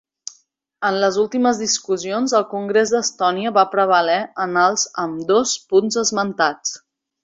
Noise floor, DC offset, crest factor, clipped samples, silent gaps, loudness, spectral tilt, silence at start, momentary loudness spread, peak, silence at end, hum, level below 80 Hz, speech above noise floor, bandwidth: -59 dBFS; under 0.1%; 18 dB; under 0.1%; none; -18 LUFS; -2.5 dB/octave; 0.8 s; 8 LU; -2 dBFS; 0.45 s; none; -64 dBFS; 41 dB; 8 kHz